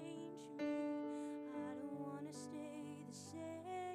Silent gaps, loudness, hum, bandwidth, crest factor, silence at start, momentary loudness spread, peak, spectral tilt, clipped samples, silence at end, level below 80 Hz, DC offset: none; -48 LUFS; none; 14 kHz; 14 dB; 0 s; 9 LU; -34 dBFS; -5.5 dB/octave; under 0.1%; 0 s; under -90 dBFS; under 0.1%